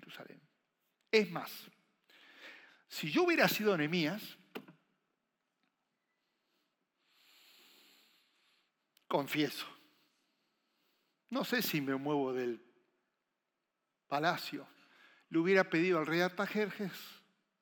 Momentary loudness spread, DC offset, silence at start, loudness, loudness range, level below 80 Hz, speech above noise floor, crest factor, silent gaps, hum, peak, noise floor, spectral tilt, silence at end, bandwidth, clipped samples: 21 LU; under 0.1%; 0.05 s; -34 LUFS; 8 LU; under -90 dBFS; 53 dB; 24 dB; none; none; -14 dBFS; -87 dBFS; -5 dB/octave; 0.45 s; 19 kHz; under 0.1%